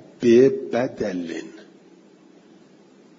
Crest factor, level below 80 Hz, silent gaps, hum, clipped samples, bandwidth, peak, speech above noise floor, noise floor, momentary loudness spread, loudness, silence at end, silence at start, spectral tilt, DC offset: 18 dB; -64 dBFS; none; none; under 0.1%; 7.6 kHz; -4 dBFS; 32 dB; -51 dBFS; 18 LU; -20 LUFS; 1.7 s; 0.2 s; -6.5 dB/octave; under 0.1%